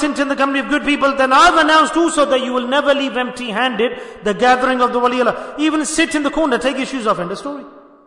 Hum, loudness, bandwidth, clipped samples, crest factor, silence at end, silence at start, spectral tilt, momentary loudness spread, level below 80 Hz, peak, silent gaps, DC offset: none; -15 LUFS; 11 kHz; under 0.1%; 14 dB; 0.3 s; 0 s; -3 dB/octave; 10 LU; -46 dBFS; -2 dBFS; none; under 0.1%